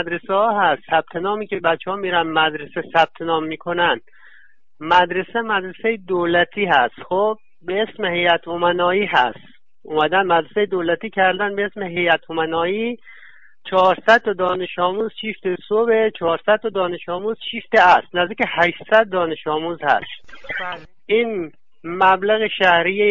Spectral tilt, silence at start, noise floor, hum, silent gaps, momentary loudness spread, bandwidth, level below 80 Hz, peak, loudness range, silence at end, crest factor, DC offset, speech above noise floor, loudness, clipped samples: -6 dB/octave; 0 s; -53 dBFS; none; none; 10 LU; 7.6 kHz; -58 dBFS; -4 dBFS; 3 LU; 0 s; 16 dB; 0.6%; 35 dB; -19 LUFS; under 0.1%